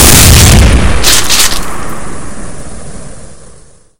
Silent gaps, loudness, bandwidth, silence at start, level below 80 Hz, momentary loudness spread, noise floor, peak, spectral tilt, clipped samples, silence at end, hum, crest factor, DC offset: none; -5 LUFS; over 20 kHz; 0 s; -14 dBFS; 25 LU; -38 dBFS; 0 dBFS; -3 dB/octave; 7%; 0 s; none; 8 dB; under 0.1%